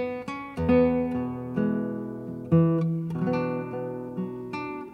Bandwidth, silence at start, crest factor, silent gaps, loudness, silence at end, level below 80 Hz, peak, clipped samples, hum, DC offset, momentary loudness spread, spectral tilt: 6 kHz; 0 s; 16 dB; none; -27 LUFS; 0 s; -52 dBFS; -10 dBFS; under 0.1%; none; under 0.1%; 12 LU; -9.5 dB/octave